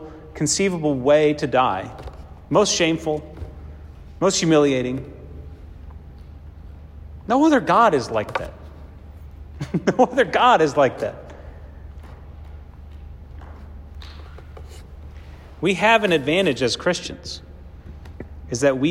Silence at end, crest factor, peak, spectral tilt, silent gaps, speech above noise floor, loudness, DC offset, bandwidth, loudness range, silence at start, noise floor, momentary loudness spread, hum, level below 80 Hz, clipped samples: 0 s; 18 dB; -4 dBFS; -4.5 dB/octave; none; 21 dB; -19 LUFS; under 0.1%; 13 kHz; 17 LU; 0 s; -40 dBFS; 25 LU; none; -42 dBFS; under 0.1%